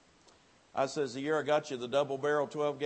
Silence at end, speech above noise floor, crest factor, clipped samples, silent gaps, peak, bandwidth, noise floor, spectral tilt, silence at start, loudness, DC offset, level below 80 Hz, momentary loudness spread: 0 s; 31 dB; 18 dB; under 0.1%; none; -16 dBFS; 8.8 kHz; -63 dBFS; -4.5 dB/octave; 0.75 s; -33 LUFS; under 0.1%; -78 dBFS; 5 LU